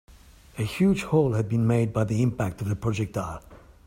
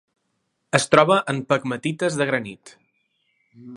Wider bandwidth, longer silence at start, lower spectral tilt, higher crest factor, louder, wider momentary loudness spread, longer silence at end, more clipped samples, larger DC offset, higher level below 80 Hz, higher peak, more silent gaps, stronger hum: first, 16 kHz vs 11.5 kHz; second, 0.55 s vs 0.75 s; first, -7.5 dB/octave vs -4.5 dB/octave; second, 16 dB vs 22 dB; second, -25 LUFS vs -20 LUFS; about the same, 10 LU vs 11 LU; first, 0.3 s vs 0 s; neither; neither; first, -48 dBFS vs -66 dBFS; second, -8 dBFS vs 0 dBFS; neither; neither